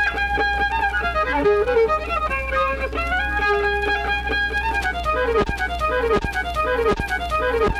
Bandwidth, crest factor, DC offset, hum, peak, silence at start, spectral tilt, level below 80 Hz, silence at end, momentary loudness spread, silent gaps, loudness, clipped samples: 14.5 kHz; 12 dB; under 0.1%; none; -8 dBFS; 0 s; -5 dB/octave; -30 dBFS; 0 s; 4 LU; none; -21 LUFS; under 0.1%